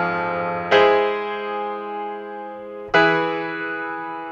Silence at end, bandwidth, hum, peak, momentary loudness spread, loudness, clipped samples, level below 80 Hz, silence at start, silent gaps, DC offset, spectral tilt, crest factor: 0 s; 7.2 kHz; none; -2 dBFS; 16 LU; -21 LUFS; under 0.1%; -58 dBFS; 0 s; none; under 0.1%; -5.5 dB/octave; 18 dB